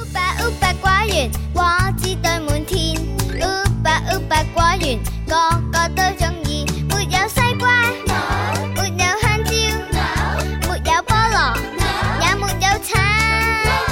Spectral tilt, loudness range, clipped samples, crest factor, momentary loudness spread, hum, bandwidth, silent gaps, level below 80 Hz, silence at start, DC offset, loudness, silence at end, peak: -4 dB/octave; 2 LU; under 0.1%; 16 dB; 6 LU; none; 17 kHz; none; -26 dBFS; 0 s; under 0.1%; -18 LUFS; 0 s; -2 dBFS